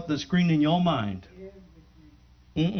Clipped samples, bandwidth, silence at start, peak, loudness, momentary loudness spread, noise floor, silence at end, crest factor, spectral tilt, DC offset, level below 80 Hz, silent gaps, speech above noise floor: under 0.1%; 6.6 kHz; 0 s; -12 dBFS; -25 LUFS; 24 LU; -55 dBFS; 0 s; 16 dB; -7 dB/octave; under 0.1%; -54 dBFS; none; 31 dB